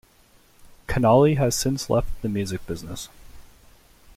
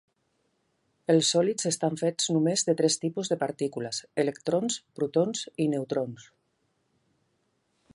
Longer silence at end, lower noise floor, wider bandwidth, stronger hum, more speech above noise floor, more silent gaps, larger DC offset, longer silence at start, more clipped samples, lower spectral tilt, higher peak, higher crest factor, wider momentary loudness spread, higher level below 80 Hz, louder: second, 0.75 s vs 1.75 s; second, -56 dBFS vs -74 dBFS; first, 16 kHz vs 11.5 kHz; neither; second, 35 dB vs 47 dB; neither; neither; second, 0.9 s vs 1.1 s; neither; first, -5.5 dB/octave vs -4 dB/octave; first, -6 dBFS vs -10 dBFS; about the same, 18 dB vs 20 dB; first, 19 LU vs 8 LU; first, -40 dBFS vs -76 dBFS; first, -22 LUFS vs -27 LUFS